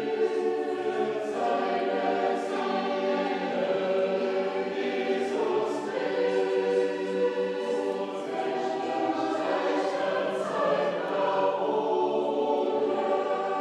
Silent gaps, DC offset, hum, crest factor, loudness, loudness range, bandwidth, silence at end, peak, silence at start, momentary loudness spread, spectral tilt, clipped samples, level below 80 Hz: none; under 0.1%; none; 14 dB; -28 LUFS; 2 LU; 10.5 kHz; 0 s; -14 dBFS; 0 s; 3 LU; -5.5 dB/octave; under 0.1%; -82 dBFS